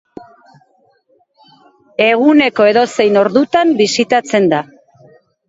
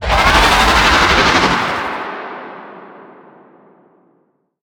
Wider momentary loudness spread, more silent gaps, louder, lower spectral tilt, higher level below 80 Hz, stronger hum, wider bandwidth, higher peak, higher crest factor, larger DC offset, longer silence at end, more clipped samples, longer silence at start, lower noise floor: second, 5 LU vs 20 LU; neither; about the same, -12 LUFS vs -11 LUFS; first, -4.5 dB/octave vs -3 dB/octave; second, -60 dBFS vs -26 dBFS; neither; second, 8 kHz vs over 20 kHz; about the same, 0 dBFS vs 0 dBFS; about the same, 14 dB vs 16 dB; neither; second, 0.85 s vs 1.6 s; neither; first, 2 s vs 0 s; second, -56 dBFS vs -60 dBFS